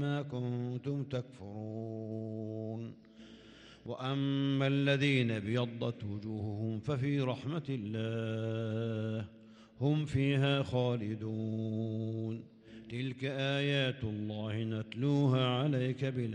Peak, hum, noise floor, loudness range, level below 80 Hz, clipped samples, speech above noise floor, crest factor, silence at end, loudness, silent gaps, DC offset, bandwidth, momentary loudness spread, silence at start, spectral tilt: -16 dBFS; none; -56 dBFS; 6 LU; -68 dBFS; under 0.1%; 22 dB; 18 dB; 0 s; -35 LUFS; none; under 0.1%; 9.2 kHz; 14 LU; 0 s; -7.5 dB/octave